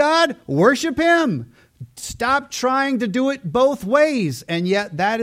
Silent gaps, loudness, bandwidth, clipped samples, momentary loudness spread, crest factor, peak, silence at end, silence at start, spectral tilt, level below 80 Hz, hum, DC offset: none; -19 LUFS; 16 kHz; under 0.1%; 7 LU; 16 dB; -2 dBFS; 0 s; 0 s; -5 dB/octave; -52 dBFS; none; under 0.1%